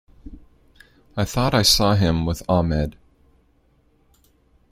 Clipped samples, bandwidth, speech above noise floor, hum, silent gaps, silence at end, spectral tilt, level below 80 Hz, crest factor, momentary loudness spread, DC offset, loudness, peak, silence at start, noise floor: under 0.1%; 16.5 kHz; 41 dB; none; none; 1.8 s; -4.5 dB/octave; -38 dBFS; 22 dB; 12 LU; under 0.1%; -19 LUFS; -2 dBFS; 0.25 s; -60 dBFS